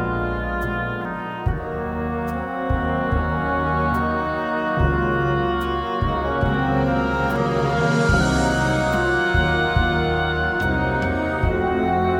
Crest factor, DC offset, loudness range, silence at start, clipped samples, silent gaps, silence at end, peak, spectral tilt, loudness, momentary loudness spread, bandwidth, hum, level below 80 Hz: 16 dB; under 0.1%; 4 LU; 0 s; under 0.1%; none; 0 s; -4 dBFS; -6.5 dB/octave; -21 LUFS; 7 LU; 16 kHz; none; -30 dBFS